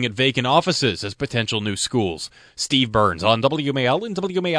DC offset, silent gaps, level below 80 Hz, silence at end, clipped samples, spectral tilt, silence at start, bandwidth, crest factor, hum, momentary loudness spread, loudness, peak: under 0.1%; none; -50 dBFS; 0 s; under 0.1%; -4.5 dB/octave; 0 s; 11 kHz; 20 dB; none; 9 LU; -20 LUFS; 0 dBFS